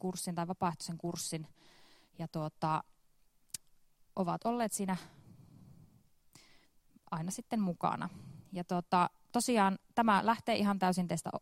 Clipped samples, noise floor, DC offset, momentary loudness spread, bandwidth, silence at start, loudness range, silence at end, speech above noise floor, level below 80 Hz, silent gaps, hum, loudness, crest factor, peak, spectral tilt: under 0.1%; -68 dBFS; under 0.1%; 16 LU; 16 kHz; 0.05 s; 9 LU; 0 s; 34 dB; -70 dBFS; none; none; -35 LUFS; 22 dB; -14 dBFS; -5 dB/octave